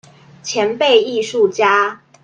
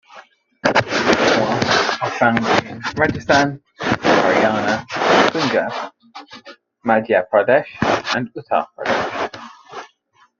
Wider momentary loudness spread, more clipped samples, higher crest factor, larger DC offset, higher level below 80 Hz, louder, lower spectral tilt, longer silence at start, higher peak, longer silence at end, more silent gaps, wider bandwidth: second, 9 LU vs 14 LU; neither; about the same, 16 dB vs 18 dB; neither; second, -66 dBFS vs -52 dBFS; about the same, -15 LUFS vs -17 LUFS; second, -2.5 dB/octave vs -4.5 dB/octave; first, 0.45 s vs 0.15 s; about the same, 0 dBFS vs 0 dBFS; second, 0.25 s vs 0.55 s; neither; first, 9.2 kHz vs 7.6 kHz